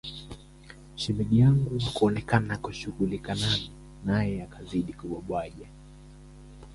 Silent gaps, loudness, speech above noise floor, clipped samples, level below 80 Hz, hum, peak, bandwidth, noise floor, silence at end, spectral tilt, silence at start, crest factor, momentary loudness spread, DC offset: none; -28 LUFS; 22 dB; under 0.1%; -48 dBFS; none; -8 dBFS; 11.5 kHz; -49 dBFS; 0 s; -6.5 dB/octave; 0.05 s; 20 dB; 22 LU; under 0.1%